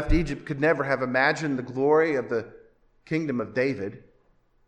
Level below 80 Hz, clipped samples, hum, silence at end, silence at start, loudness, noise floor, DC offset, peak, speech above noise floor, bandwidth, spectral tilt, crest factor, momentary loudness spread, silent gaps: -38 dBFS; under 0.1%; none; 0.7 s; 0 s; -25 LUFS; -63 dBFS; under 0.1%; -8 dBFS; 38 dB; 9.6 kHz; -6.5 dB/octave; 18 dB; 9 LU; none